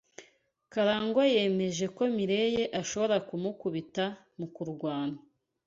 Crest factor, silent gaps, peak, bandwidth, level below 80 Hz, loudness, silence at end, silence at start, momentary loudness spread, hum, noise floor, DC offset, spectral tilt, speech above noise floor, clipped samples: 16 dB; none; -14 dBFS; 7.8 kHz; -68 dBFS; -30 LUFS; 0.5 s; 0.2 s; 12 LU; none; -65 dBFS; under 0.1%; -5 dB/octave; 35 dB; under 0.1%